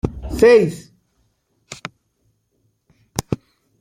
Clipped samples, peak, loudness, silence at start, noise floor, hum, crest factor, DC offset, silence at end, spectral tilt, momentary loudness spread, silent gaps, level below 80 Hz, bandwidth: under 0.1%; -2 dBFS; -17 LUFS; 0.05 s; -67 dBFS; none; 18 dB; under 0.1%; 0.45 s; -5.5 dB/octave; 24 LU; none; -40 dBFS; 16 kHz